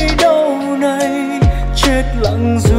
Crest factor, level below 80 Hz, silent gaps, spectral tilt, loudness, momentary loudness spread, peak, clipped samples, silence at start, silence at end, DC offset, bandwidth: 12 dB; -20 dBFS; none; -5.5 dB/octave; -14 LUFS; 5 LU; 0 dBFS; under 0.1%; 0 s; 0 s; under 0.1%; 16 kHz